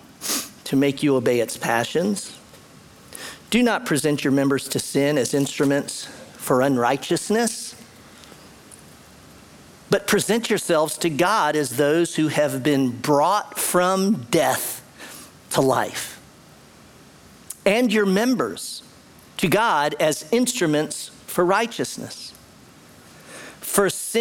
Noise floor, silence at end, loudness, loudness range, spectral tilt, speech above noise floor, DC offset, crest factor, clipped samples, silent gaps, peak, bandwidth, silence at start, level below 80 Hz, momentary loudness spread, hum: -48 dBFS; 0 s; -21 LUFS; 5 LU; -4 dB/octave; 28 dB; under 0.1%; 20 dB; under 0.1%; none; -2 dBFS; 18 kHz; 0.2 s; -60 dBFS; 15 LU; none